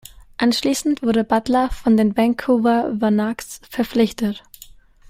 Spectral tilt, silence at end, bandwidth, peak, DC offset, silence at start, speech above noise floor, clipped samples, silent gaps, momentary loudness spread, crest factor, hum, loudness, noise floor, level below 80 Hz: -5 dB/octave; 0.7 s; 16 kHz; -4 dBFS; under 0.1%; 0.4 s; 27 dB; under 0.1%; none; 9 LU; 16 dB; none; -19 LUFS; -45 dBFS; -44 dBFS